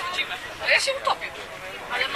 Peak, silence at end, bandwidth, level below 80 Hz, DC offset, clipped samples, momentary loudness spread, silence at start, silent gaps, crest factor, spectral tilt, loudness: -6 dBFS; 0 s; 14 kHz; -56 dBFS; under 0.1%; under 0.1%; 15 LU; 0 s; none; 22 dB; -0.5 dB/octave; -24 LUFS